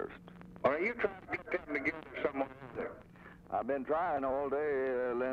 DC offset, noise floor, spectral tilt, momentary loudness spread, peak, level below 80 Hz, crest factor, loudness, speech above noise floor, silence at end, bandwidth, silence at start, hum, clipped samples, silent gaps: under 0.1%; -55 dBFS; -7.5 dB/octave; 13 LU; -16 dBFS; -64 dBFS; 20 dB; -36 LUFS; 20 dB; 0 s; 7.2 kHz; 0 s; none; under 0.1%; none